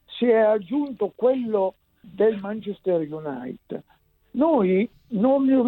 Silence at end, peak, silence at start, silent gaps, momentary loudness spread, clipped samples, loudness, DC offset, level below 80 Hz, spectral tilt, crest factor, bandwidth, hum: 0 s; -8 dBFS; 0.1 s; none; 15 LU; under 0.1%; -23 LUFS; under 0.1%; -64 dBFS; -10 dB/octave; 14 dB; 4.2 kHz; none